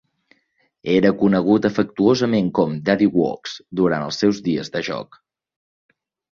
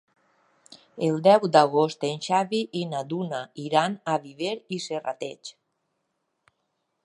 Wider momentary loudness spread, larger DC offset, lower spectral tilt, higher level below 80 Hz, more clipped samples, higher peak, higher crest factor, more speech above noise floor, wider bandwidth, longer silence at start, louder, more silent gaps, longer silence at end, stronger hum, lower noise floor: second, 11 LU vs 15 LU; neither; about the same, -6.5 dB/octave vs -5.5 dB/octave; first, -56 dBFS vs -78 dBFS; neither; about the same, -2 dBFS vs -4 dBFS; second, 18 dB vs 24 dB; second, 47 dB vs 53 dB; second, 7.2 kHz vs 11.5 kHz; about the same, 0.85 s vs 0.95 s; first, -19 LUFS vs -25 LUFS; neither; second, 1.35 s vs 1.55 s; neither; second, -66 dBFS vs -77 dBFS